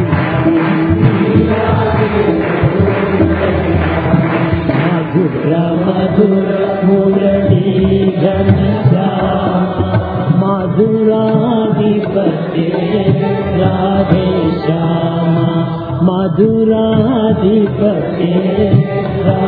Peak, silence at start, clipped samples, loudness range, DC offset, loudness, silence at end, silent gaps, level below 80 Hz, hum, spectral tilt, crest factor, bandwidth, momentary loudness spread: 0 dBFS; 0 s; under 0.1%; 1 LU; under 0.1%; -12 LUFS; 0 s; none; -34 dBFS; none; -12 dB/octave; 12 dB; 4.9 kHz; 3 LU